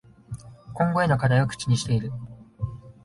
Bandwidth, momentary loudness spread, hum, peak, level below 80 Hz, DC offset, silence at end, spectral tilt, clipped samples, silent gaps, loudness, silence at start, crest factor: 11.5 kHz; 20 LU; none; -8 dBFS; -50 dBFS; under 0.1%; 0.15 s; -6 dB/octave; under 0.1%; none; -25 LUFS; 0.3 s; 18 dB